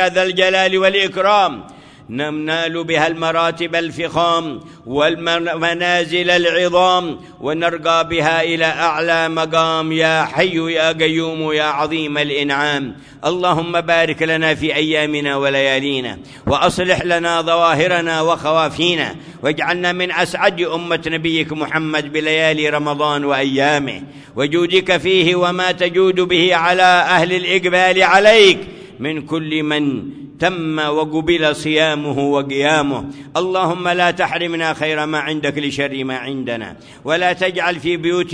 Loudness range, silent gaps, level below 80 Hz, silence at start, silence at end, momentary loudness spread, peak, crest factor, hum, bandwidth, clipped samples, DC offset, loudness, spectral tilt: 5 LU; none; -50 dBFS; 0 s; 0 s; 9 LU; 0 dBFS; 16 dB; none; 11 kHz; under 0.1%; under 0.1%; -16 LUFS; -4.5 dB/octave